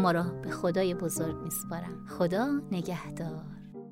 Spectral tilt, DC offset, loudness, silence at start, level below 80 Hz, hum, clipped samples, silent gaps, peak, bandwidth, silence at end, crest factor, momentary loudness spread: -5.5 dB/octave; under 0.1%; -32 LUFS; 0 s; -58 dBFS; none; under 0.1%; none; -14 dBFS; 16 kHz; 0 s; 18 dB; 11 LU